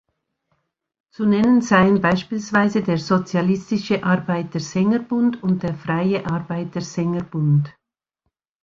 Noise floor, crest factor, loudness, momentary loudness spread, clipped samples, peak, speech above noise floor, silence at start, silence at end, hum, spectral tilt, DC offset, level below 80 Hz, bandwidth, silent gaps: -76 dBFS; 18 dB; -20 LUFS; 9 LU; under 0.1%; -2 dBFS; 57 dB; 1.2 s; 0.95 s; none; -7 dB/octave; under 0.1%; -54 dBFS; 7.6 kHz; none